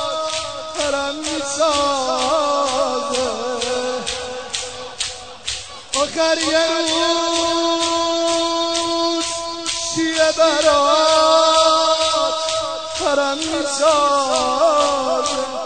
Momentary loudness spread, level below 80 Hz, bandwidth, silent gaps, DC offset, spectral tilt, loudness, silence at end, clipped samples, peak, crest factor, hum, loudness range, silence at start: 11 LU; -50 dBFS; 9.4 kHz; none; 0.5%; -1.5 dB/octave; -18 LUFS; 0 s; under 0.1%; 0 dBFS; 18 dB; none; 6 LU; 0 s